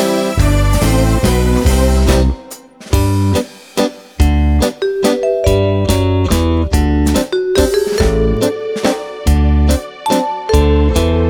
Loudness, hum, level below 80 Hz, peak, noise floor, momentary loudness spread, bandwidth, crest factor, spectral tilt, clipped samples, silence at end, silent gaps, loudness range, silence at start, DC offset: -14 LUFS; none; -16 dBFS; 0 dBFS; -34 dBFS; 6 LU; 19.5 kHz; 12 dB; -6 dB/octave; under 0.1%; 0 s; none; 1 LU; 0 s; under 0.1%